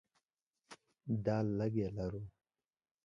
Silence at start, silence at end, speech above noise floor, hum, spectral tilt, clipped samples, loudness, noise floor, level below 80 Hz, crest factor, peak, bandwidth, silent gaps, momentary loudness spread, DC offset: 0.7 s; 0.75 s; 53 dB; none; -9 dB/octave; under 0.1%; -38 LUFS; -90 dBFS; -62 dBFS; 18 dB; -22 dBFS; 10.5 kHz; none; 24 LU; under 0.1%